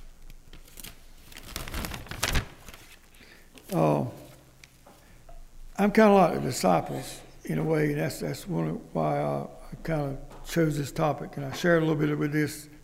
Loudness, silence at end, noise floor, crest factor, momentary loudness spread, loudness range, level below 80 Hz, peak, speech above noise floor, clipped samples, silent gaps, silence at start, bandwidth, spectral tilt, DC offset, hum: -27 LUFS; 0.05 s; -54 dBFS; 22 dB; 20 LU; 8 LU; -44 dBFS; -8 dBFS; 28 dB; under 0.1%; none; 0 s; 16 kHz; -6 dB/octave; under 0.1%; none